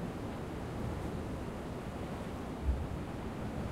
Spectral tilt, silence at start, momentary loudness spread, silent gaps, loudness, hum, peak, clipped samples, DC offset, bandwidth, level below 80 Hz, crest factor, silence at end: -7 dB/octave; 0 s; 4 LU; none; -40 LUFS; none; -22 dBFS; under 0.1%; under 0.1%; 15.5 kHz; -44 dBFS; 18 dB; 0 s